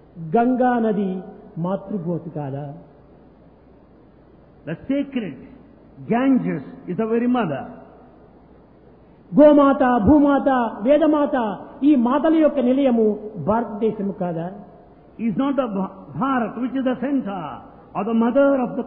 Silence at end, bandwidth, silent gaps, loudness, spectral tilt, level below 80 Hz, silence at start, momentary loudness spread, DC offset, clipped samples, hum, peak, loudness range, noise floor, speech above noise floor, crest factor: 0 s; 4 kHz; none; -20 LUFS; -11.5 dB/octave; -50 dBFS; 0.15 s; 16 LU; under 0.1%; under 0.1%; none; -4 dBFS; 14 LU; -49 dBFS; 30 dB; 18 dB